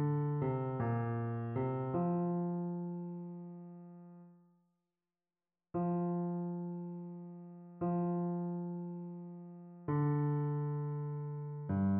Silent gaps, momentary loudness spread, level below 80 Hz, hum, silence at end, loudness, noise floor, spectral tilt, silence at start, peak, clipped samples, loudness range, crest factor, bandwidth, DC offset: none; 16 LU; -72 dBFS; none; 0 s; -38 LUFS; under -90 dBFS; -11.5 dB/octave; 0 s; -24 dBFS; under 0.1%; 6 LU; 14 dB; 3.2 kHz; under 0.1%